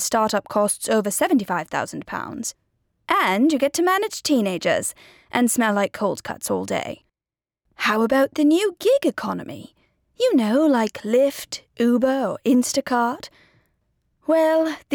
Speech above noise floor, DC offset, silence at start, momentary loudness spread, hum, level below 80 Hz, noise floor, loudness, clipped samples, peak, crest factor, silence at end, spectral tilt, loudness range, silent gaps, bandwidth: over 69 dB; under 0.1%; 0 s; 12 LU; none; -62 dBFS; under -90 dBFS; -21 LUFS; under 0.1%; -4 dBFS; 16 dB; 0 s; -4 dB/octave; 2 LU; none; over 20 kHz